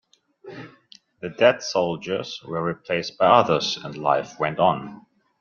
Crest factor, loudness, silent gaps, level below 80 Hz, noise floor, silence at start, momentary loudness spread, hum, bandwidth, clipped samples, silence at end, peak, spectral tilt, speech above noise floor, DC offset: 22 dB; -22 LUFS; none; -64 dBFS; -53 dBFS; 0.45 s; 22 LU; none; 7.2 kHz; under 0.1%; 0.4 s; -2 dBFS; -4.5 dB/octave; 31 dB; under 0.1%